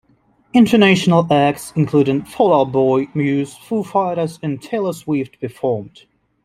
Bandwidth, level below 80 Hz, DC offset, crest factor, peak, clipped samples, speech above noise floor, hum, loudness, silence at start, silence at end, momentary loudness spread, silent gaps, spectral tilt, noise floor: 15.5 kHz; -56 dBFS; under 0.1%; 16 dB; -2 dBFS; under 0.1%; 41 dB; none; -17 LUFS; 0.55 s; 0.55 s; 11 LU; none; -6.5 dB/octave; -57 dBFS